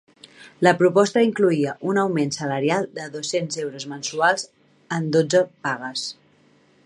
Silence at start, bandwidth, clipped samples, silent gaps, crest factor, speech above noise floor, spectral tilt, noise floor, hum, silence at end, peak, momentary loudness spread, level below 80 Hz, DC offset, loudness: 0.4 s; 11.5 kHz; under 0.1%; none; 20 dB; 36 dB; -4.5 dB/octave; -57 dBFS; none; 0.75 s; -2 dBFS; 12 LU; -70 dBFS; under 0.1%; -22 LUFS